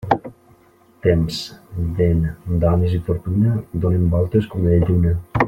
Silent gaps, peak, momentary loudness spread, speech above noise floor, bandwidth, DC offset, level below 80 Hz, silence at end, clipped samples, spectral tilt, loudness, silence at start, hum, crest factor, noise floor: none; -2 dBFS; 7 LU; 35 dB; 9 kHz; under 0.1%; -36 dBFS; 0 s; under 0.1%; -8 dB/octave; -19 LUFS; 0 s; none; 16 dB; -52 dBFS